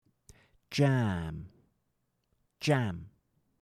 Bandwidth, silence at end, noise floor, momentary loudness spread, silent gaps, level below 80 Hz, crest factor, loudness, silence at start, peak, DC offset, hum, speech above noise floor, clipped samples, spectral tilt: 13.5 kHz; 0.55 s; -79 dBFS; 16 LU; none; -60 dBFS; 20 dB; -31 LUFS; 0.7 s; -14 dBFS; under 0.1%; none; 49 dB; under 0.1%; -6.5 dB/octave